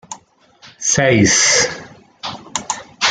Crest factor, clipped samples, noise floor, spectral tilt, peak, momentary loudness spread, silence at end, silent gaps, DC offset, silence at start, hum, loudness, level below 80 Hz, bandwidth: 16 dB; under 0.1%; -48 dBFS; -2.5 dB/octave; -2 dBFS; 21 LU; 0 s; none; under 0.1%; 0.1 s; none; -14 LUFS; -48 dBFS; 11 kHz